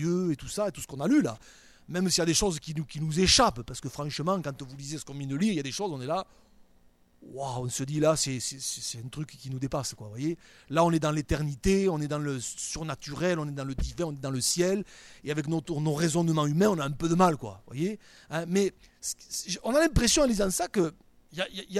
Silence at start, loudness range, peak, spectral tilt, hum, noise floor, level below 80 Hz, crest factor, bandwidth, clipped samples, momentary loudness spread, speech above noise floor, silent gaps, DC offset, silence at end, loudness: 0 s; 5 LU; -8 dBFS; -4.5 dB/octave; none; -61 dBFS; -46 dBFS; 20 dB; 16 kHz; under 0.1%; 13 LU; 32 dB; none; under 0.1%; 0 s; -29 LUFS